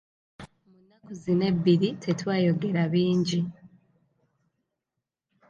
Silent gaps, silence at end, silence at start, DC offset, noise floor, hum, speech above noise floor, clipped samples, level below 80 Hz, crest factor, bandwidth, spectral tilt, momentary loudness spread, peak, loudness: none; 1.85 s; 0.4 s; under 0.1%; -86 dBFS; none; 61 dB; under 0.1%; -64 dBFS; 18 dB; 7.4 kHz; -7 dB/octave; 10 LU; -10 dBFS; -25 LUFS